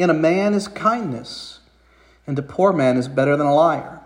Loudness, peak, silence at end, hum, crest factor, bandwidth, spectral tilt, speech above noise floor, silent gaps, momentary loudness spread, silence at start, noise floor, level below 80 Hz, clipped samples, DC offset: -19 LUFS; -2 dBFS; 0.05 s; none; 16 dB; 15 kHz; -6.5 dB/octave; 35 dB; none; 16 LU; 0 s; -54 dBFS; -56 dBFS; under 0.1%; under 0.1%